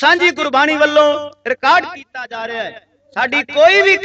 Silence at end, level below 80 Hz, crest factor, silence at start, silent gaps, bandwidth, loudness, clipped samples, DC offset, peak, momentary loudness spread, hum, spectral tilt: 0 s; -60 dBFS; 14 dB; 0 s; none; 8.2 kHz; -13 LUFS; under 0.1%; under 0.1%; 0 dBFS; 17 LU; none; -2.5 dB/octave